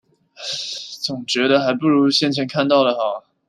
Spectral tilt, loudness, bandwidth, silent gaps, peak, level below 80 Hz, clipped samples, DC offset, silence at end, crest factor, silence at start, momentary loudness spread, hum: -4.5 dB/octave; -18 LUFS; 13 kHz; none; -2 dBFS; -68 dBFS; under 0.1%; under 0.1%; 0.3 s; 18 dB; 0.4 s; 10 LU; none